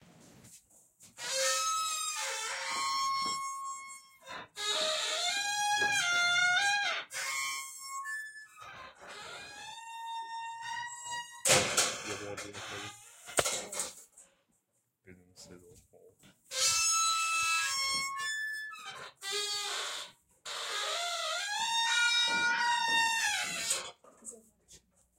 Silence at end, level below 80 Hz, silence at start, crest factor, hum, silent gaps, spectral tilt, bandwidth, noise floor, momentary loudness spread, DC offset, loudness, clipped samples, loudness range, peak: 0.4 s; -72 dBFS; 0.2 s; 24 dB; none; none; 0.5 dB/octave; 16 kHz; -78 dBFS; 19 LU; under 0.1%; -31 LUFS; under 0.1%; 10 LU; -10 dBFS